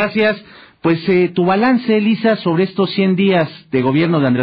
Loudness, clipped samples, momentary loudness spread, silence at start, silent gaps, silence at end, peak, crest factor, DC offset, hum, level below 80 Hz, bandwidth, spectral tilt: -15 LUFS; under 0.1%; 5 LU; 0 s; none; 0 s; -4 dBFS; 10 dB; under 0.1%; none; -56 dBFS; 5.4 kHz; -10 dB/octave